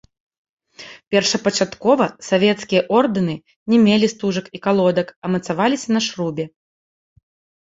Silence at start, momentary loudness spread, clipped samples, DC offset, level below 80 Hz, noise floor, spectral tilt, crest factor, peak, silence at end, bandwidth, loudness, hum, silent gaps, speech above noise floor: 0.8 s; 9 LU; under 0.1%; under 0.1%; -60 dBFS; -42 dBFS; -5 dB/octave; 18 dB; -2 dBFS; 1.15 s; 8 kHz; -18 LUFS; none; 1.07-1.11 s, 3.56-3.66 s, 5.16-5.22 s; 24 dB